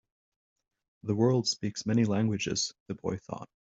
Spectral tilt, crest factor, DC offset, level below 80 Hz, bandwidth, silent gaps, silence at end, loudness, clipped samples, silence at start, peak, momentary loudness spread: -5 dB/octave; 18 dB; under 0.1%; -66 dBFS; 8 kHz; 2.80-2.86 s; 0.3 s; -30 LUFS; under 0.1%; 1.05 s; -12 dBFS; 13 LU